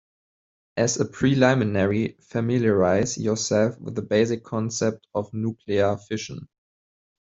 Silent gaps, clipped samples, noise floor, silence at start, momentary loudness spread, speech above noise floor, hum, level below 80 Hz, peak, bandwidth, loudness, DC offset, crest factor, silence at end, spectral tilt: none; under 0.1%; under -90 dBFS; 0.75 s; 11 LU; over 67 dB; none; -58 dBFS; -4 dBFS; 8 kHz; -23 LUFS; under 0.1%; 20 dB; 0.95 s; -5.5 dB/octave